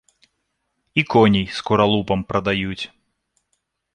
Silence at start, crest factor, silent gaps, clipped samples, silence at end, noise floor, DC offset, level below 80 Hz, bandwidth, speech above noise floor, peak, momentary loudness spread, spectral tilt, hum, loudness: 0.95 s; 18 dB; none; under 0.1%; 1.1 s; -74 dBFS; under 0.1%; -46 dBFS; 9.6 kHz; 55 dB; -2 dBFS; 11 LU; -6.5 dB/octave; none; -19 LUFS